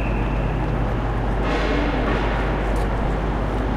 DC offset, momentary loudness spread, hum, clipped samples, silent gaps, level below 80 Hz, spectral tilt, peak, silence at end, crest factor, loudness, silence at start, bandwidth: under 0.1%; 2 LU; none; under 0.1%; none; -24 dBFS; -7.5 dB/octave; -10 dBFS; 0 s; 12 dB; -23 LUFS; 0 s; 9.2 kHz